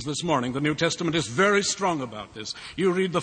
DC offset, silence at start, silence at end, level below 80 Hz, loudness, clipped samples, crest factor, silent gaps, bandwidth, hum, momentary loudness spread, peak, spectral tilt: under 0.1%; 0 s; 0 s; -56 dBFS; -25 LUFS; under 0.1%; 18 dB; none; 9.4 kHz; none; 14 LU; -6 dBFS; -4 dB/octave